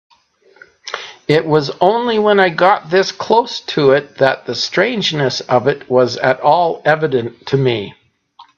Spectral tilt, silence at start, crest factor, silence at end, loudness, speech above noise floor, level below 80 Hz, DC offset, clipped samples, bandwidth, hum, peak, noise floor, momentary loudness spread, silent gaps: -5 dB/octave; 0.85 s; 16 dB; 0.15 s; -14 LUFS; 37 dB; -58 dBFS; under 0.1%; under 0.1%; 7.6 kHz; none; 0 dBFS; -51 dBFS; 8 LU; none